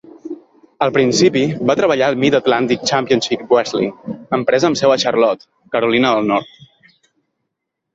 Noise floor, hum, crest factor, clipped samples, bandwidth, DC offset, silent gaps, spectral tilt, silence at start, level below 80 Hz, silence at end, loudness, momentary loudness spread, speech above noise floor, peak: -77 dBFS; none; 14 dB; under 0.1%; 8 kHz; under 0.1%; none; -4.5 dB/octave; 0.25 s; -56 dBFS; 1.5 s; -15 LUFS; 9 LU; 62 dB; -2 dBFS